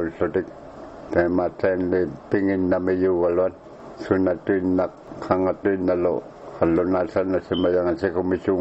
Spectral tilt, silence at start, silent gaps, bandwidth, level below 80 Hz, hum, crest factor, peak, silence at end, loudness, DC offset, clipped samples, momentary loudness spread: -8.5 dB/octave; 0 s; none; 8 kHz; -52 dBFS; none; 20 dB; -2 dBFS; 0 s; -22 LUFS; under 0.1%; under 0.1%; 14 LU